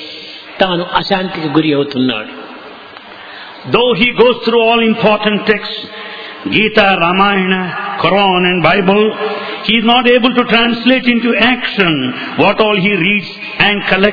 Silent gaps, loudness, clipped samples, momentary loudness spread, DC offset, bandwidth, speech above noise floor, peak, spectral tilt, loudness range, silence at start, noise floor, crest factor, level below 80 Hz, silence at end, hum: none; -11 LUFS; 0.2%; 17 LU; under 0.1%; 5.4 kHz; 21 dB; 0 dBFS; -7 dB/octave; 5 LU; 0 s; -33 dBFS; 12 dB; -44 dBFS; 0 s; none